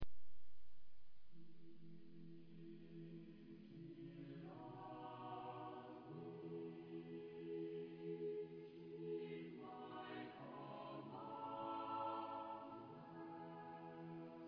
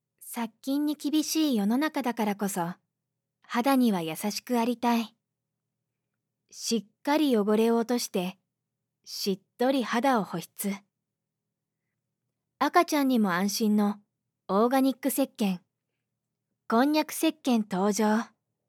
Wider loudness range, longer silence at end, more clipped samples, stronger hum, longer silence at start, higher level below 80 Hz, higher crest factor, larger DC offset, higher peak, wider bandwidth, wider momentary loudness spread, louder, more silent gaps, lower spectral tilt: first, 9 LU vs 4 LU; second, 0 s vs 0.45 s; neither; neither; second, 0 s vs 0.2 s; first, -76 dBFS vs -90 dBFS; about the same, 14 dB vs 18 dB; neither; second, -34 dBFS vs -10 dBFS; second, 5.2 kHz vs 18 kHz; about the same, 12 LU vs 10 LU; second, -53 LUFS vs -27 LUFS; neither; first, -6 dB/octave vs -4.5 dB/octave